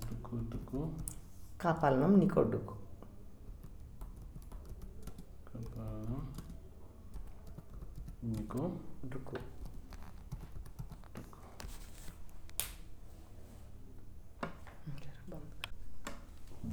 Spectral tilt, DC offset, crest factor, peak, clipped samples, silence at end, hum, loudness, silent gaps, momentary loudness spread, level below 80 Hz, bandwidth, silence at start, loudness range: -6.5 dB/octave; under 0.1%; 26 dB; -14 dBFS; under 0.1%; 0 s; none; -38 LUFS; none; 22 LU; -50 dBFS; over 20 kHz; 0 s; 16 LU